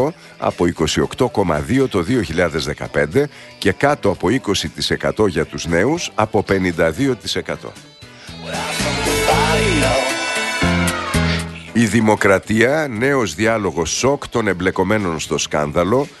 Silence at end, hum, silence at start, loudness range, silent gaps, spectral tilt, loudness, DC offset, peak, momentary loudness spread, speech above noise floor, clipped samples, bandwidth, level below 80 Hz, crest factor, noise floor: 0.05 s; none; 0 s; 3 LU; none; -4.5 dB/octave; -18 LUFS; under 0.1%; 0 dBFS; 7 LU; 19 dB; under 0.1%; 12.5 kHz; -36 dBFS; 18 dB; -37 dBFS